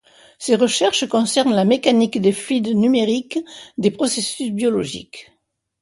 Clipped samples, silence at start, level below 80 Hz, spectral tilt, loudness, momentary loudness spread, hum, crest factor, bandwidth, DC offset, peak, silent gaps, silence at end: under 0.1%; 0.4 s; -60 dBFS; -4 dB/octave; -18 LUFS; 12 LU; none; 16 dB; 11.5 kHz; under 0.1%; -2 dBFS; none; 0.6 s